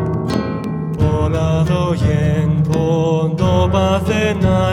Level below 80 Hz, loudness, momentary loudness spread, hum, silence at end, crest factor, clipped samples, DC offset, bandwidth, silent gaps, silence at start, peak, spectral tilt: -30 dBFS; -16 LUFS; 5 LU; none; 0 s; 14 dB; under 0.1%; under 0.1%; 12 kHz; none; 0 s; -2 dBFS; -7.5 dB/octave